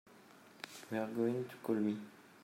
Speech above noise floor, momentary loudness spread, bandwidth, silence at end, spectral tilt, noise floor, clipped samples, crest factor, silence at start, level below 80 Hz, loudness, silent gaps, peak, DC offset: 23 dB; 16 LU; 16 kHz; 0 s; -6.5 dB/octave; -61 dBFS; under 0.1%; 16 dB; 0.05 s; -88 dBFS; -39 LUFS; none; -24 dBFS; under 0.1%